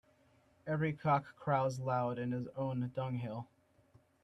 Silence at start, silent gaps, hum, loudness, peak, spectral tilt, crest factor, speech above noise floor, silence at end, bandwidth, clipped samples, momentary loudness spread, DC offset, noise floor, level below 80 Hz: 0.65 s; none; none; -37 LUFS; -18 dBFS; -8 dB/octave; 20 dB; 33 dB; 0.8 s; 10.5 kHz; under 0.1%; 10 LU; under 0.1%; -69 dBFS; -72 dBFS